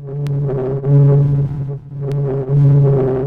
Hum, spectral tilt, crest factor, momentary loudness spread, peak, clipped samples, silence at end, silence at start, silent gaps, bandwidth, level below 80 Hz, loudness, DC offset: none; -12 dB/octave; 10 dB; 11 LU; -4 dBFS; under 0.1%; 0 s; 0 s; none; 2.4 kHz; -40 dBFS; -15 LUFS; under 0.1%